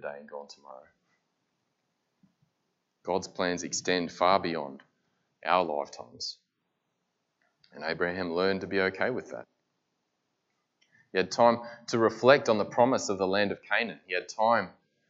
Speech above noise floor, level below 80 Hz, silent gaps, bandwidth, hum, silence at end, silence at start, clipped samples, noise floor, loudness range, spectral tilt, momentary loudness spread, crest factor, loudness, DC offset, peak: 52 dB; -76 dBFS; none; 8 kHz; none; 0.4 s; 0.05 s; under 0.1%; -80 dBFS; 9 LU; -4 dB/octave; 17 LU; 26 dB; -28 LUFS; under 0.1%; -4 dBFS